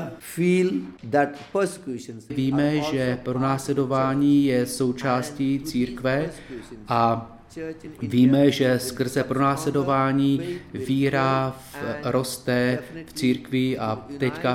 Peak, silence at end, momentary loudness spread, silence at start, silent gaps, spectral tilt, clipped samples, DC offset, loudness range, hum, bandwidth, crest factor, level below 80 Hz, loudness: -6 dBFS; 0 s; 14 LU; 0 s; none; -6 dB/octave; under 0.1%; under 0.1%; 3 LU; none; 16 kHz; 16 dB; -54 dBFS; -23 LUFS